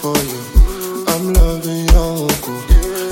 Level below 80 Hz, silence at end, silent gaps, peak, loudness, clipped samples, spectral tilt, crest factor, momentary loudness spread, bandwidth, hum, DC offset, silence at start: -14 dBFS; 0 s; none; 0 dBFS; -16 LUFS; under 0.1%; -5 dB/octave; 12 dB; 4 LU; 17 kHz; none; 0.2%; 0 s